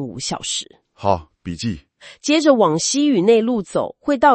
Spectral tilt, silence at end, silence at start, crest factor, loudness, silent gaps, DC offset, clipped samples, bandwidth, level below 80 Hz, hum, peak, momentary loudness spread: -4 dB/octave; 0 s; 0 s; 18 dB; -18 LUFS; none; under 0.1%; under 0.1%; 8.8 kHz; -52 dBFS; none; 0 dBFS; 13 LU